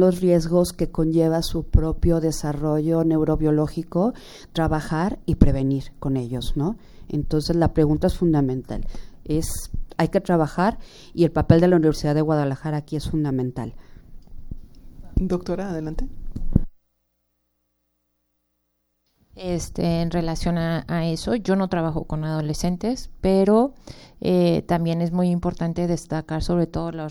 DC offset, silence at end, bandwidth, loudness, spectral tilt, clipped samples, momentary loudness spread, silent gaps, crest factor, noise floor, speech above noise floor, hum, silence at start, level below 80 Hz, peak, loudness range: under 0.1%; 0 s; 17.5 kHz; -23 LUFS; -7 dB/octave; under 0.1%; 11 LU; none; 22 dB; -73 dBFS; 51 dB; 60 Hz at -50 dBFS; 0 s; -32 dBFS; 0 dBFS; 9 LU